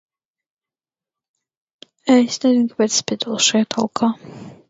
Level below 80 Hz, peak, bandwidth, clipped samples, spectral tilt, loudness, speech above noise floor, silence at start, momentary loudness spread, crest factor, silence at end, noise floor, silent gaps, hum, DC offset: -66 dBFS; -2 dBFS; 7.8 kHz; under 0.1%; -3 dB/octave; -18 LUFS; over 72 dB; 2.05 s; 10 LU; 20 dB; 0.15 s; under -90 dBFS; none; none; under 0.1%